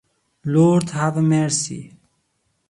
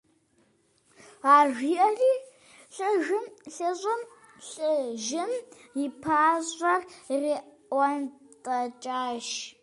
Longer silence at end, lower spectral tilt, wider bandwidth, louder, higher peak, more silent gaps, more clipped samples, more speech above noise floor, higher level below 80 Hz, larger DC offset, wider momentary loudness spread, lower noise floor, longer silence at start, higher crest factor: first, 0.8 s vs 0.1 s; first, -6 dB/octave vs -2.5 dB/octave; about the same, 11.5 kHz vs 11.5 kHz; first, -19 LUFS vs -27 LUFS; first, -4 dBFS vs -8 dBFS; neither; neither; first, 51 dB vs 40 dB; first, -58 dBFS vs -74 dBFS; neither; about the same, 14 LU vs 13 LU; about the same, -69 dBFS vs -67 dBFS; second, 0.45 s vs 1.25 s; about the same, 16 dB vs 20 dB